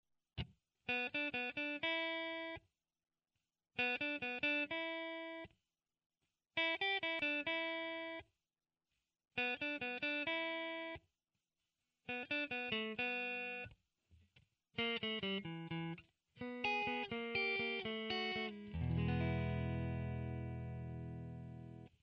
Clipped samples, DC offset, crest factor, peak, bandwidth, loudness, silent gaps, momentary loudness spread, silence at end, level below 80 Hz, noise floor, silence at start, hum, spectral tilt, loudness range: under 0.1%; under 0.1%; 20 dB; -24 dBFS; 6.6 kHz; -41 LUFS; 6.06-6.10 s; 13 LU; 0.15 s; -62 dBFS; under -90 dBFS; 0.35 s; none; -6.5 dB/octave; 3 LU